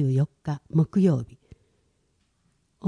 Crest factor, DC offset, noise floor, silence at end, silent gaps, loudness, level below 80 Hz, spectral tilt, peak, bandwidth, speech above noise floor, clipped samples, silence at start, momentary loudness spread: 16 dB; under 0.1%; -70 dBFS; 0 s; none; -25 LUFS; -60 dBFS; -10 dB/octave; -10 dBFS; 10 kHz; 46 dB; under 0.1%; 0 s; 11 LU